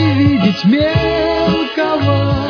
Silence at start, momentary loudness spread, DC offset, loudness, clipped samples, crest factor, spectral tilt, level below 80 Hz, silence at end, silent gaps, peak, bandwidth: 0 s; 3 LU; under 0.1%; -14 LUFS; under 0.1%; 12 dB; -8 dB/octave; -32 dBFS; 0 s; none; 0 dBFS; 5.4 kHz